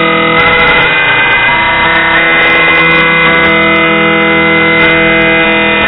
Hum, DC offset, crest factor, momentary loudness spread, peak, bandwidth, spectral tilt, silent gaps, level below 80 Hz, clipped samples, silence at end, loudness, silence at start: none; under 0.1%; 6 dB; 2 LU; 0 dBFS; 5.4 kHz; -7 dB/octave; none; -32 dBFS; 0.3%; 0 s; -5 LUFS; 0 s